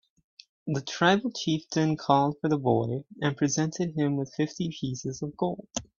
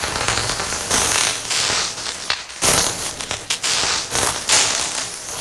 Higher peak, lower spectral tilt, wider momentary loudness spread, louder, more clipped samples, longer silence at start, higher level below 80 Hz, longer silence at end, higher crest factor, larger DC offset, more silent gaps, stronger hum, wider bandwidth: second, -6 dBFS vs -2 dBFS; first, -5 dB/octave vs -0.5 dB/octave; about the same, 9 LU vs 9 LU; second, -28 LUFS vs -18 LUFS; neither; first, 0.65 s vs 0 s; second, -64 dBFS vs -42 dBFS; first, 0.15 s vs 0 s; about the same, 22 dB vs 20 dB; neither; neither; neither; second, 7.4 kHz vs 17.5 kHz